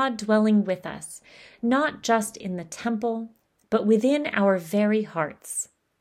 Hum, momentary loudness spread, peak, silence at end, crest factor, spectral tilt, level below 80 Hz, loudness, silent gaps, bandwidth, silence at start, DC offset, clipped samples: none; 14 LU; -8 dBFS; 0.35 s; 16 dB; -5 dB/octave; -68 dBFS; -24 LUFS; none; 15 kHz; 0 s; under 0.1%; under 0.1%